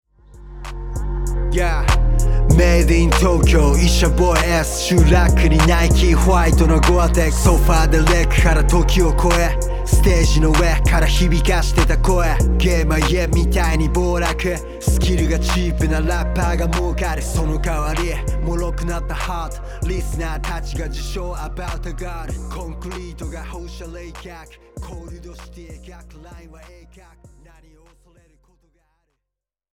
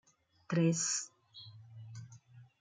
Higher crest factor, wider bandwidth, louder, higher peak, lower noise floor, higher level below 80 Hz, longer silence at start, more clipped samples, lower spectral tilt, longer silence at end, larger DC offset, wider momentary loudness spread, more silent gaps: about the same, 16 dB vs 20 dB; first, 16.5 kHz vs 9.6 kHz; first, -17 LUFS vs -33 LUFS; first, -2 dBFS vs -20 dBFS; first, -83 dBFS vs -58 dBFS; first, -18 dBFS vs -80 dBFS; second, 0.35 s vs 0.5 s; neither; about the same, -5.5 dB/octave vs -4.5 dB/octave; first, 3.25 s vs 0.15 s; neither; second, 17 LU vs 23 LU; neither